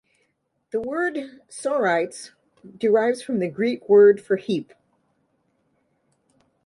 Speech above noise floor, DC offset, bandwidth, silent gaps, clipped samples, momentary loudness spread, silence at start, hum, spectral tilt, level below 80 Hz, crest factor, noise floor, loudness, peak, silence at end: 51 dB; under 0.1%; 11.5 kHz; none; under 0.1%; 16 LU; 0.75 s; none; -5.5 dB/octave; -70 dBFS; 18 dB; -72 dBFS; -22 LUFS; -6 dBFS; 2.05 s